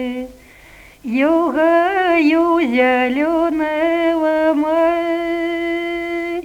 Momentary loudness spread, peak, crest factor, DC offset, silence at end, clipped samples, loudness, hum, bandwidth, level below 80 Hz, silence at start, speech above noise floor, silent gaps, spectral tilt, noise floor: 8 LU; -2 dBFS; 14 dB; under 0.1%; 0 s; under 0.1%; -16 LUFS; 50 Hz at -55 dBFS; 12.5 kHz; -50 dBFS; 0 s; 28 dB; none; -5 dB/octave; -43 dBFS